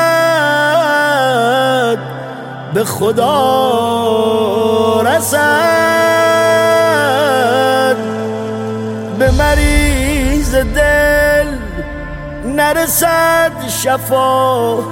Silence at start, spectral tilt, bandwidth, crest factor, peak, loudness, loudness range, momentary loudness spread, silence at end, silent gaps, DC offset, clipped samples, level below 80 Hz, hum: 0 s; -4 dB/octave; 17 kHz; 12 dB; 0 dBFS; -12 LUFS; 3 LU; 10 LU; 0 s; none; under 0.1%; under 0.1%; -24 dBFS; none